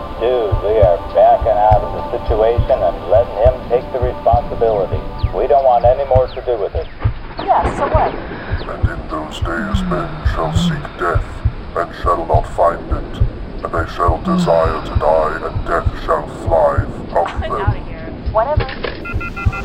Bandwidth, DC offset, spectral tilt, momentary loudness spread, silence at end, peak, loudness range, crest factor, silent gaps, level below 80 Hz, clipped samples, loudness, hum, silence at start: 11 kHz; under 0.1%; -7.5 dB/octave; 10 LU; 0 s; 0 dBFS; 5 LU; 16 dB; none; -24 dBFS; under 0.1%; -17 LUFS; none; 0 s